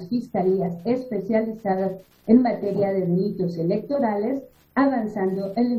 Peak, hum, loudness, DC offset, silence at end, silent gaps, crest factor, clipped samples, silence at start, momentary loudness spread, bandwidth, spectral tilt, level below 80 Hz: -4 dBFS; none; -23 LUFS; under 0.1%; 0 s; none; 18 dB; under 0.1%; 0 s; 7 LU; 13.5 kHz; -9.5 dB/octave; -62 dBFS